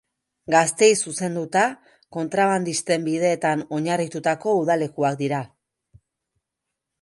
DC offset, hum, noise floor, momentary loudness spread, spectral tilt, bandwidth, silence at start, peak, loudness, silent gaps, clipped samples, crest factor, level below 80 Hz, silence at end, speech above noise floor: under 0.1%; none; -83 dBFS; 9 LU; -4 dB/octave; 11.5 kHz; 0.5 s; -4 dBFS; -22 LUFS; none; under 0.1%; 20 dB; -68 dBFS; 1.55 s; 61 dB